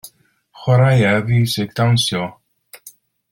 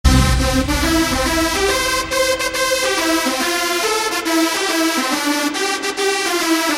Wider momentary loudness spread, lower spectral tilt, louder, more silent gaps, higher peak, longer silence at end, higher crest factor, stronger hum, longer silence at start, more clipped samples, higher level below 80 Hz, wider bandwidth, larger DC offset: first, 12 LU vs 2 LU; first, -5.5 dB/octave vs -3.5 dB/octave; about the same, -16 LUFS vs -16 LUFS; neither; about the same, -2 dBFS vs 0 dBFS; first, 0.45 s vs 0 s; about the same, 16 dB vs 16 dB; neither; about the same, 0.05 s vs 0.05 s; neither; second, -50 dBFS vs -26 dBFS; about the same, 16 kHz vs 16.5 kHz; neither